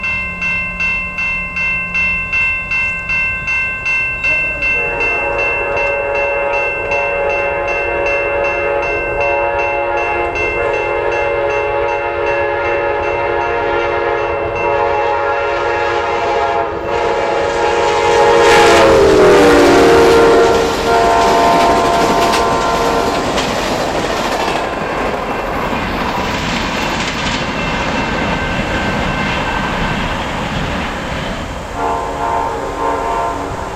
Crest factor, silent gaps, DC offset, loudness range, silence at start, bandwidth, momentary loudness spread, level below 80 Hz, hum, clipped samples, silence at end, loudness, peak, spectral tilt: 12 dB; none; under 0.1%; 8 LU; 0 s; 15.5 kHz; 10 LU; -32 dBFS; none; under 0.1%; 0 s; -14 LUFS; -2 dBFS; -4.5 dB/octave